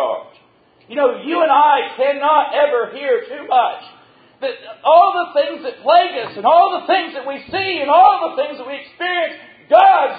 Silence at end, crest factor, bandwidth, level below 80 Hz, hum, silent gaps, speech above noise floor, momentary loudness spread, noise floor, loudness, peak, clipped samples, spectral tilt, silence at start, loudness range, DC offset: 0 s; 16 dB; 5 kHz; -64 dBFS; none; none; 38 dB; 15 LU; -53 dBFS; -15 LUFS; 0 dBFS; under 0.1%; -6.5 dB/octave; 0 s; 2 LU; under 0.1%